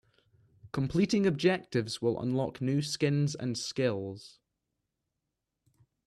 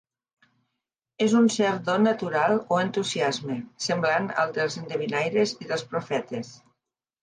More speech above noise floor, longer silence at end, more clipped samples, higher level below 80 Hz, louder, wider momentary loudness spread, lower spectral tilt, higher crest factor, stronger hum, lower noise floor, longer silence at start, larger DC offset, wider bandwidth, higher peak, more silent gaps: about the same, 56 dB vs 59 dB; first, 1.75 s vs 0.7 s; neither; first, -64 dBFS vs -72 dBFS; second, -31 LUFS vs -25 LUFS; about the same, 9 LU vs 9 LU; first, -6 dB/octave vs -4.5 dB/octave; about the same, 18 dB vs 16 dB; neither; about the same, -86 dBFS vs -84 dBFS; second, 0.65 s vs 1.2 s; neither; first, 12.5 kHz vs 10 kHz; second, -14 dBFS vs -10 dBFS; neither